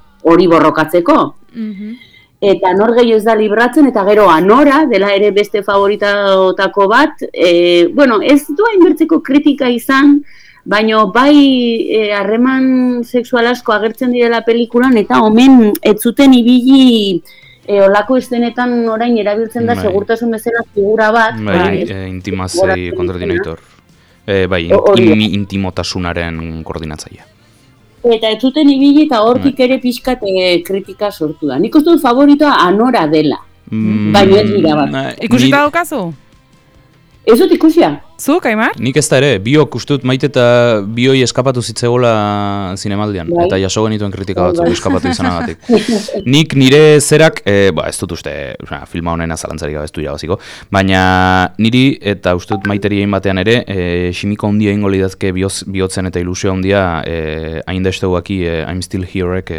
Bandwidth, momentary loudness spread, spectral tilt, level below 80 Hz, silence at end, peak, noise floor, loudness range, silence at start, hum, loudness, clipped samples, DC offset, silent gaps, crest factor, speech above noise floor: 16.5 kHz; 12 LU; -5.5 dB/octave; -40 dBFS; 0 s; 0 dBFS; -46 dBFS; 6 LU; 0.25 s; none; -11 LUFS; under 0.1%; under 0.1%; none; 10 dB; 36 dB